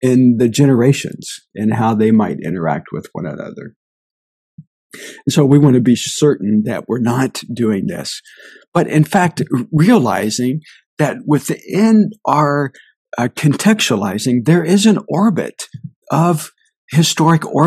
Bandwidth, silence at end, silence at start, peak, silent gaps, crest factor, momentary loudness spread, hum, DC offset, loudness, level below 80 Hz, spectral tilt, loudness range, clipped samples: 14.5 kHz; 0 s; 0 s; 0 dBFS; 3.76-4.58 s, 4.67-4.90 s, 8.68-8.72 s, 10.86-10.97 s, 12.96-13.05 s, 15.96-16.02 s, 16.76-16.88 s; 14 dB; 15 LU; none; under 0.1%; -15 LUFS; -58 dBFS; -6 dB/octave; 4 LU; under 0.1%